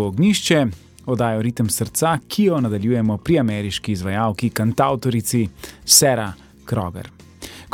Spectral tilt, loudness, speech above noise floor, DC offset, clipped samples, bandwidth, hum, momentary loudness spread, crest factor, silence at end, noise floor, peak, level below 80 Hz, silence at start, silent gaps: -4.5 dB/octave; -19 LUFS; 20 dB; under 0.1%; under 0.1%; 17.5 kHz; none; 15 LU; 20 dB; 0.05 s; -39 dBFS; 0 dBFS; -48 dBFS; 0 s; none